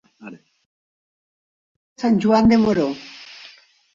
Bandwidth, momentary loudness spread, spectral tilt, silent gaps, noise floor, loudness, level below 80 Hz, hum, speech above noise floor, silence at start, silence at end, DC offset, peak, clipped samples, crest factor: 7.4 kHz; 23 LU; -7 dB/octave; 0.66-1.96 s; -48 dBFS; -17 LUFS; -50 dBFS; none; 32 dB; 0.25 s; 0.7 s; under 0.1%; -4 dBFS; under 0.1%; 18 dB